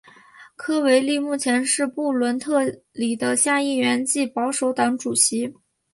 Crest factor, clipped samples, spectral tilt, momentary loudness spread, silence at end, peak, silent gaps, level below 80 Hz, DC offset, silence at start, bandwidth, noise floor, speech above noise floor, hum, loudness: 16 dB; under 0.1%; -2 dB/octave; 8 LU; 0.4 s; -6 dBFS; none; -70 dBFS; under 0.1%; 0.4 s; 11.5 kHz; -48 dBFS; 27 dB; none; -21 LUFS